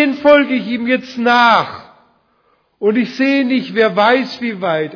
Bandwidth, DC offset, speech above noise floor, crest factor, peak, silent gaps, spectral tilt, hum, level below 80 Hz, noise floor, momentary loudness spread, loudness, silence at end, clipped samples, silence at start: 5.4 kHz; under 0.1%; 45 dB; 14 dB; 0 dBFS; none; -5.5 dB/octave; none; -58 dBFS; -59 dBFS; 9 LU; -14 LUFS; 0 s; under 0.1%; 0 s